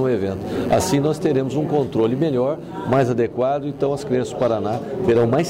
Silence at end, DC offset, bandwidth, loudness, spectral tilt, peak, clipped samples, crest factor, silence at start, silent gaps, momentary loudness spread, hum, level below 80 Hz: 0 s; under 0.1%; 16 kHz; -20 LUFS; -6.5 dB/octave; -8 dBFS; under 0.1%; 12 dB; 0 s; none; 5 LU; none; -50 dBFS